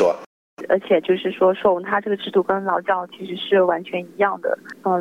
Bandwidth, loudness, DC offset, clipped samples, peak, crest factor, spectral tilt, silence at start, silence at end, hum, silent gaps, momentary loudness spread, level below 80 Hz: 7.4 kHz; -21 LUFS; under 0.1%; under 0.1%; -4 dBFS; 16 dB; -6.5 dB/octave; 0 s; 0 s; none; 0.26-0.57 s; 10 LU; -64 dBFS